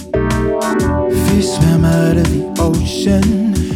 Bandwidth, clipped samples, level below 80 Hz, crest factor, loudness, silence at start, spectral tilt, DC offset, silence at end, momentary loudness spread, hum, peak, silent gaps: 17 kHz; under 0.1%; -26 dBFS; 12 dB; -14 LUFS; 0 s; -6.5 dB/octave; under 0.1%; 0 s; 4 LU; none; -2 dBFS; none